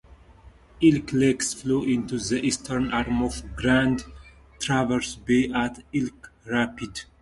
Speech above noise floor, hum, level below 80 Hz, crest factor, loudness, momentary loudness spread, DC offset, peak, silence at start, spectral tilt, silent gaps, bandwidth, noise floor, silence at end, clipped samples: 27 dB; none; -44 dBFS; 18 dB; -25 LUFS; 9 LU; under 0.1%; -6 dBFS; 0.1 s; -5 dB/octave; none; 11.5 kHz; -51 dBFS; 0.2 s; under 0.1%